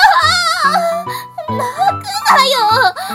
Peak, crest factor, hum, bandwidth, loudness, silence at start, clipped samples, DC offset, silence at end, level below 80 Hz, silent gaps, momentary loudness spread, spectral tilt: 0 dBFS; 12 dB; none; 17.5 kHz; -12 LUFS; 0 s; 0.3%; under 0.1%; 0 s; -50 dBFS; none; 12 LU; -2 dB/octave